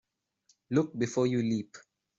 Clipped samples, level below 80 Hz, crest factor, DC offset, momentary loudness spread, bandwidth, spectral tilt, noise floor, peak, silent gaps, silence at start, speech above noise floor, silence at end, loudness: under 0.1%; -70 dBFS; 18 dB; under 0.1%; 6 LU; 7.8 kHz; -6.5 dB/octave; -71 dBFS; -14 dBFS; none; 0.7 s; 42 dB; 0.4 s; -30 LUFS